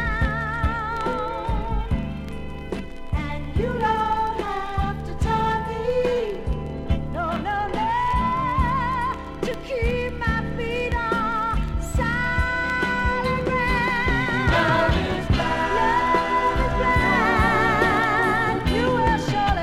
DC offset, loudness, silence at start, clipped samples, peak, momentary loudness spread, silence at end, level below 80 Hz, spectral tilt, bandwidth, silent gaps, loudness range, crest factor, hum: under 0.1%; -23 LUFS; 0 s; under 0.1%; -6 dBFS; 9 LU; 0 s; -30 dBFS; -6 dB/octave; 15.5 kHz; none; 6 LU; 16 dB; none